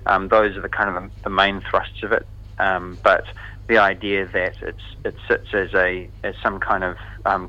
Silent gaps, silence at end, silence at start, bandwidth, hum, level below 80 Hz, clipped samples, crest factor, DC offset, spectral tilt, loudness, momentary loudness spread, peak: none; 0 s; 0 s; 8.4 kHz; 50 Hz at -40 dBFS; -40 dBFS; under 0.1%; 20 dB; under 0.1%; -6 dB/octave; -21 LUFS; 14 LU; 0 dBFS